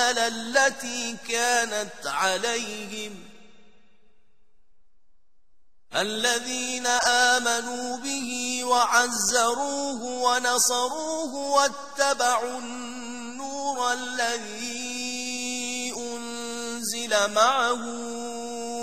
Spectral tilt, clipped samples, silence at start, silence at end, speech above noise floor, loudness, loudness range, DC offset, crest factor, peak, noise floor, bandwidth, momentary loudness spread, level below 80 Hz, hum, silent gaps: -0.5 dB/octave; under 0.1%; 0 s; 0 s; 42 dB; -25 LUFS; 8 LU; 0.5%; 22 dB; -4 dBFS; -67 dBFS; 14 kHz; 12 LU; -66 dBFS; none; none